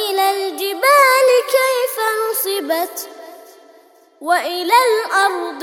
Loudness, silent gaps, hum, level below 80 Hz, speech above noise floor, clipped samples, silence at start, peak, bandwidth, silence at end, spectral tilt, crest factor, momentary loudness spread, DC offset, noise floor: -15 LUFS; none; none; -78 dBFS; 31 dB; under 0.1%; 0 s; 0 dBFS; over 20 kHz; 0 s; 1 dB/octave; 16 dB; 10 LU; under 0.1%; -48 dBFS